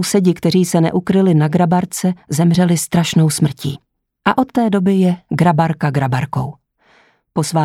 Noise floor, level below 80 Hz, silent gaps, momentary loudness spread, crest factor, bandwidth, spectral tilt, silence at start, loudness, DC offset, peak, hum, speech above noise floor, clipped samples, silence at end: -53 dBFS; -50 dBFS; none; 8 LU; 14 dB; 15 kHz; -6 dB/octave; 0 s; -15 LUFS; under 0.1%; 0 dBFS; none; 39 dB; under 0.1%; 0 s